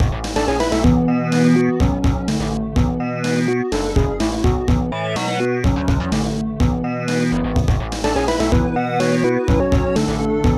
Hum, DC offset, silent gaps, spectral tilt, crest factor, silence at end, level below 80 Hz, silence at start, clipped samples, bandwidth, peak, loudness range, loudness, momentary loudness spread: none; 0.4%; none; -6.5 dB/octave; 16 dB; 0 s; -26 dBFS; 0 s; under 0.1%; 13 kHz; -2 dBFS; 2 LU; -19 LUFS; 5 LU